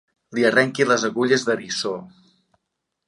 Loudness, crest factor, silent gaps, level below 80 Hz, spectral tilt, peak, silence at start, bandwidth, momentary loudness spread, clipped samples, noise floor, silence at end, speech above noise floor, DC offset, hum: -20 LUFS; 20 dB; none; -70 dBFS; -3.5 dB/octave; -4 dBFS; 0.3 s; 11.5 kHz; 11 LU; under 0.1%; -79 dBFS; 1 s; 59 dB; under 0.1%; none